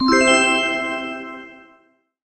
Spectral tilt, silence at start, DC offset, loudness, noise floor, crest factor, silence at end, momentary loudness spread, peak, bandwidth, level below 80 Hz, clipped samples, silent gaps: -2 dB/octave; 0 s; under 0.1%; -17 LUFS; -58 dBFS; 18 dB; 0.7 s; 20 LU; -2 dBFS; 8.6 kHz; -52 dBFS; under 0.1%; none